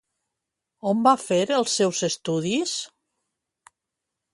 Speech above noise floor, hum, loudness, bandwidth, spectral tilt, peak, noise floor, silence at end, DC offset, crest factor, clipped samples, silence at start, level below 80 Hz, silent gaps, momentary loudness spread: 62 dB; none; -23 LUFS; 11.5 kHz; -4 dB/octave; -4 dBFS; -84 dBFS; 1.45 s; under 0.1%; 20 dB; under 0.1%; 0.85 s; -70 dBFS; none; 11 LU